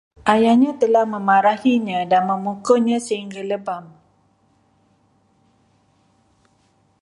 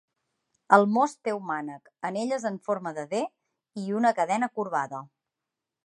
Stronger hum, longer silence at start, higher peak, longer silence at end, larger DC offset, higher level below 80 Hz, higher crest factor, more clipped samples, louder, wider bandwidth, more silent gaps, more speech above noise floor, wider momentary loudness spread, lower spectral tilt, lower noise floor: neither; second, 0.25 s vs 0.7 s; about the same, 0 dBFS vs -2 dBFS; first, 3.15 s vs 0.8 s; neither; first, -64 dBFS vs -82 dBFS; second, 20 dB vs 26 dB; neither; first, -18 LUFS vs -27 LUFS; about the same, 11.5 kHz vs 11 kHz; neither; second, 43 dB vs 60 dB; second, 11 LU vs 15 LU; about the same, -5.5 dB/octave vs -5.5 dB/octave; second, -61 dBFS vs -87 dBFS